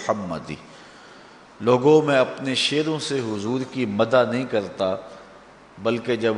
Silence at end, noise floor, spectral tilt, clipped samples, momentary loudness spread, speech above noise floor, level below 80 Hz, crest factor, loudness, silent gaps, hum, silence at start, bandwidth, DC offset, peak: 0 s; -47 dBFS; -5 dB/octave; under 0.1%; 15 LU; 25 dB; -62 dBFS; 20 dB; -22 LUFS; none; none; 0 s; 10 kHz; under 0.1%; -4 dBFS